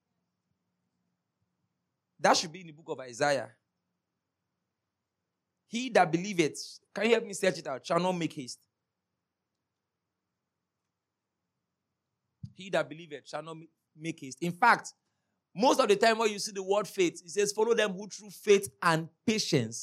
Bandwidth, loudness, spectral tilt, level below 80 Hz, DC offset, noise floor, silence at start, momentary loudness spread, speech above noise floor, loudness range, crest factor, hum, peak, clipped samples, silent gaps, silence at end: 15.5 kHz; -29 LUFS; -4 dB/octave; -84 dBFS; under 0.1%; -87 dBFS; 2.2 s; 17 LU; 58 dB; 12 LU; 24 dB; none; -8 dBFS; under 0.1%; none; 0 s